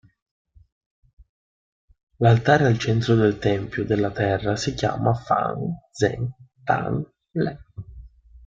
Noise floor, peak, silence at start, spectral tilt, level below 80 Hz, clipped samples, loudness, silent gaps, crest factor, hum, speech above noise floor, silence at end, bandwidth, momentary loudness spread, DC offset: -45 dBFS; -4 dBFS; 2.2 s; -6.5 dB/octave; -50 dBFS; under 0.1%; -22 LUFS; none; 20 dB; none; 23 dB; 0.4 s; 7.6 kHz; 13 LU; under 0.1%